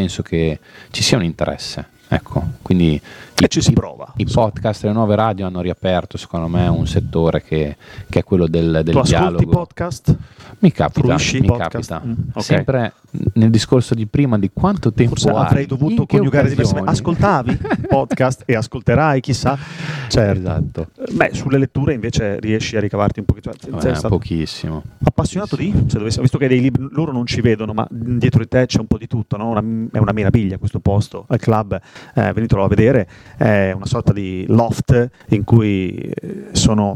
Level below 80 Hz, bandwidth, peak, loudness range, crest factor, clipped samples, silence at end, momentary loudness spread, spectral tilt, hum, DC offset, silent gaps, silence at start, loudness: -34 dBFS; 13 kHz; 0 dBFS; 3 LU; 16 dB; under 0.1%; 0 s; 9 LU; -6.5 dB/octave; none; under 0.1%; none; 0 s; -17 LUFS